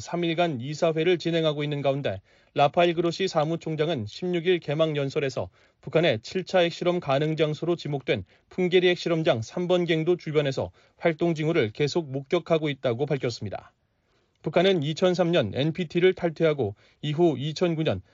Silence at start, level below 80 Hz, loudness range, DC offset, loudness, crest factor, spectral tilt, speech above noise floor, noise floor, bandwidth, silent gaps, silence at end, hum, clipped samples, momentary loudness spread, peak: 0 s; -64 dBFS; 2 LU; under 0.1%; -25 LUFS; 18 dB; -5 dB/octave; 44 dB; -69 dBFS; 7.6 kHz; none; 0.15 s; none; under 0.1%; 8 LU; -8 dBFS